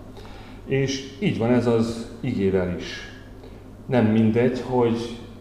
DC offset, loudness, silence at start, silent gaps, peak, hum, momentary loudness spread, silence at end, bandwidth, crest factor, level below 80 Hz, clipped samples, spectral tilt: 0.2%; -23 LUFS; 0 s; none; -8 dBFS; none; 22 LU; 0 s; 10.5 kHz; 16 dB; -46 dBFS; under 0.1%; -7 dB/octave